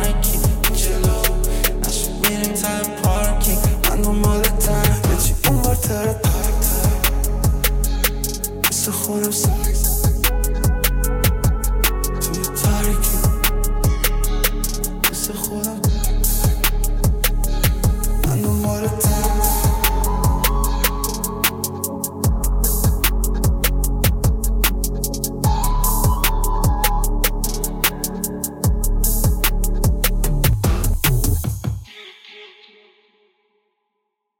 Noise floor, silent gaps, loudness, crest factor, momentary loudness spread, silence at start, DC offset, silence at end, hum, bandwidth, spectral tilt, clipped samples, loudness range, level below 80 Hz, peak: -75 dBFS; none; -19 LUFS; 18 dB; 5 LU; 0 s; under 0.1%; 1.95 s; none; 17 kHz; -4 dB/octave; under 0.1%; 2 LU; -20 dBFS; 0 dBFS